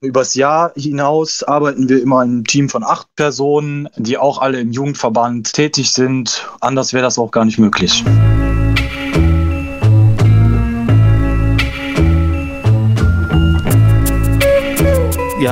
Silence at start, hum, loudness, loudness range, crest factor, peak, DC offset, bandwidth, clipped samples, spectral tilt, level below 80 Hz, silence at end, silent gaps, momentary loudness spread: 0 s; none; -13 LUFS; 3 LU; 12 dB; 0 dBFS; under 0.1%; 16 kHz; under 0.1%; -5.5 dB/octave; -22 dBFS; 0 s; none; 6 LU